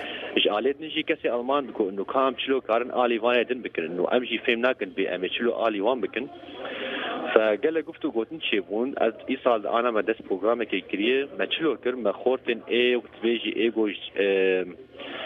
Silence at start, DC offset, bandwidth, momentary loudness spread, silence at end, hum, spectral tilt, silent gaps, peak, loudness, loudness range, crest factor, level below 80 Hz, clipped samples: 0 s; under 0.1%; 5 kHz; 7 LU; 0 s; none; -6.5 dB/octave; none; -2 dBFS; -25 LUFS; 2 LU; 24 dB; -68 dBFS; under 0.1%